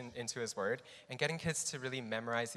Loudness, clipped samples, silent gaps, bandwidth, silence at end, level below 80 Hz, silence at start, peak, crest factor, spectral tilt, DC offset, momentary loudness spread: -38 LUFS; under 0.1%; none; 14 kHz; 0 s; -72 dBFS; 0 s; -18 dBFS; 22 dB; -3 dB/octave; under 0.1%; 6 LU